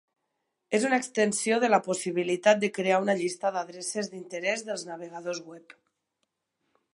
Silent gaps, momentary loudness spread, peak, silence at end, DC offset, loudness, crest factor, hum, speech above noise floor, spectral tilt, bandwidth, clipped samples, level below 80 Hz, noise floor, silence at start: none; 12 LU; -6 dBFS; 1.2 s; under 0.1%; -27 LUFS; 22 dB; none; 53 dB; -3.5 dB/octave; 11.5 kHz; under 0.1%; -82 dBFS; -81 dBFS; 0.7 s